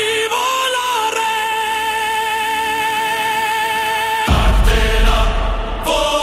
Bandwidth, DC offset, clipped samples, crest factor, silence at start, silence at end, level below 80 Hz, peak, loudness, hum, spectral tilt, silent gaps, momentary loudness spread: 16 kHz; under 0.1%; under 0.1%; 12 dB; 0 s; 0 s; -20 dBFS; -4 dBFS; -16 LUFS; none; -3 dB/octave; none; 3 LU